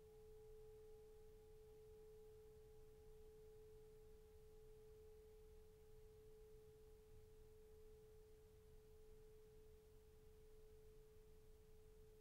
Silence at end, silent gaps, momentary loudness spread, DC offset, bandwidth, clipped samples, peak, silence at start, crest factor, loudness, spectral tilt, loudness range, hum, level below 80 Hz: 0 s; none; 4 LU; under 0.1%; 15.5 kHz; under 0.1%; -54 dBFS; 0 s; 12 dB; -67 LUFS; -5.5 dB/octave; 3 LU; none; -68 dBFS